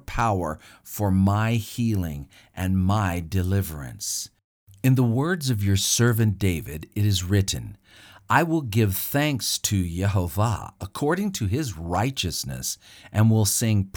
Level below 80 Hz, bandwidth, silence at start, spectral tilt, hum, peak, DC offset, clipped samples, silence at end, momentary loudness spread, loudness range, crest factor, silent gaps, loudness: -46 dBFS; over 20 kHz; 0.1 s; -5 dB/octave; none; -4 dBFS; under 0.1%; under 0.1%; 0.05 s; 11 LU; 3 LU; 20 dB; 4.44-4.67 s; -24 LUFS